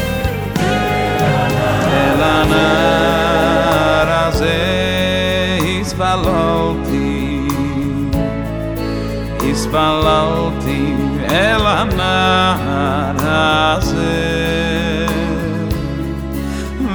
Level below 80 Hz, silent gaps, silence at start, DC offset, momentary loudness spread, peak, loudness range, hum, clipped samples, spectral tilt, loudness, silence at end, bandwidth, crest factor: -28 dBFS; none; 0 s; under 0.1%; 8 LU; 0 dBFS; 4 LU; none; under 0.1%; -5.5 dB/octave; -15 LUFS; 0 s; over 20 kHz; 14 dB